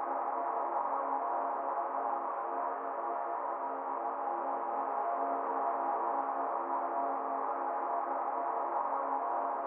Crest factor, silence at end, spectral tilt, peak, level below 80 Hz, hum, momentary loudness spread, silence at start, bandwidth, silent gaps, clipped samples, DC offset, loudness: 14 dB; 0 s; 4.5 dB/octave; -20 dBFS; under -90 dBFS; none; 3 LU; 0 s; 3.4 kHz; none; under 0.1%; under 0.1%; -35 LUFS